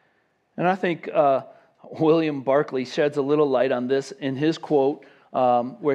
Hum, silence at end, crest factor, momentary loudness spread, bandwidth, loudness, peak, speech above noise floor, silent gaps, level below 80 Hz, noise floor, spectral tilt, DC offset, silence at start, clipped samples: none; 0 s; 16 dB; 6 LU; 9.8 kHz; -23 LUFS; -6 dBFS; 45 dB; none; -80 dBFS; -67 dBFS; -6.5 dB/octave; under 0.1%; 0.55 s; under 0.1%